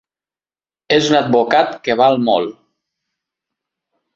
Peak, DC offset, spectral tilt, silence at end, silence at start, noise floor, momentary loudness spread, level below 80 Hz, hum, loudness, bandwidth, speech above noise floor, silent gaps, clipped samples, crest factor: 0 dBFS; under 0.1%; -4.5 dB/octave; 1.65 s; 0.9 s; under -90 dBFS; 5 LU; -58 dBFS; none; -14 LUFS; 8 kHz; over 76 dB; none; under 0.1%; 18 dB